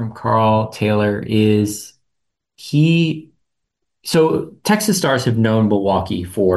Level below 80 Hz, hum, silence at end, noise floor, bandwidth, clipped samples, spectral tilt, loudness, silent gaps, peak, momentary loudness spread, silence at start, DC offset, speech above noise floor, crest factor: -52 dBFS; none; 0 s; -77 dBFS; 13 kHz; under 0.1%; -6 dB/octave; -17 LUFS; none; -4 dBFS; 8 LU; 0 s; under 0.1%; 61 dB; 12 dB